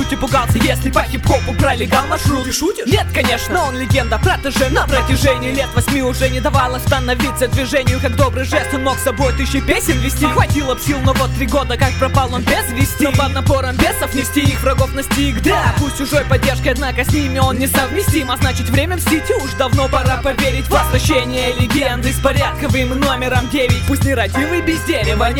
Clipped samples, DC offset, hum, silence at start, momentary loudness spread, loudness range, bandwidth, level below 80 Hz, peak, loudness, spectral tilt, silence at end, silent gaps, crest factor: under 0.1%; under 0.1%; none; 0 s; 3 LU; 1 LU; 19 kHz; -24 dBFS; 0 dBFS; -15 LUFS; -5 dB/octave; 0 s; none; 14 dB